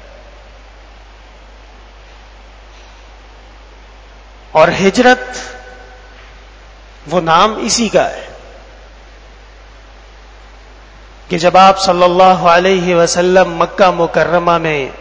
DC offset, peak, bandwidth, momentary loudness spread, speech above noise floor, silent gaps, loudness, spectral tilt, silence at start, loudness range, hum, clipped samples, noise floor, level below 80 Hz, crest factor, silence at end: under 0.1%; 0 dBFS; 8 kHz; 13 LU; 27 dB; none; -11 LUFS; -4 dB/octave; 4.55 s; 10 LU; 50 Hz at -40 dBFS; 0.4%; -37 dBFS; -38 dBFS; 14 dB; 0 s